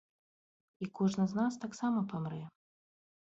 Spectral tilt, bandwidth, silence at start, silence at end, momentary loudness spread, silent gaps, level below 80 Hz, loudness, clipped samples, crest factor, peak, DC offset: -7 dB/octave; 8 kHz; 0.8 s; 0.85 s; 13 LU; none; -74 dBFS; -35 LUFS; under 0.1%; 18 dB; -20 dBFS; under 0.1%